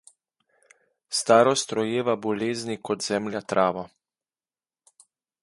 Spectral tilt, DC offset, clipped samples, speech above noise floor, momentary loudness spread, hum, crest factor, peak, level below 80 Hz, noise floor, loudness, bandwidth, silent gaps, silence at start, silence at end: -4 dB/octave; under 0.1%; under 0.1%; over 66 dB; 11 LU; none; 24 dB; -4 dBFS; -68 dBFS; under -90 dBFS; -24 LUFS; 11.5 kHz; none; 1.1 s; 1.55 s